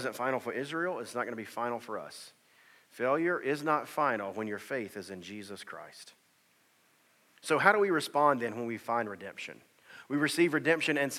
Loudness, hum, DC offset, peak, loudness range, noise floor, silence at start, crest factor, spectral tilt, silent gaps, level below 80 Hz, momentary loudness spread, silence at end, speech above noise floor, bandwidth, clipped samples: -31 LUFS; none; under 0.1%; -8 dBFS; 7 LU; -68 dBFS; 0 s; 26 dB; -4.5 dB/octave; none; under -90 dBFS; 17 LU; 0 s; 37 dB; 16 kHz; under 0.1%